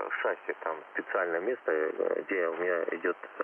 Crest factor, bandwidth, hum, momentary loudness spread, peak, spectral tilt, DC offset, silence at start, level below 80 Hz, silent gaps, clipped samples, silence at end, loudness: 16 dB; 3.4 kHz; none; 5 LU; -14 dBFS; -7 dB/octave; under 0.1%; 0 s; under -90 dBFS; none; under 0.1%; 0 s; -32 LUFS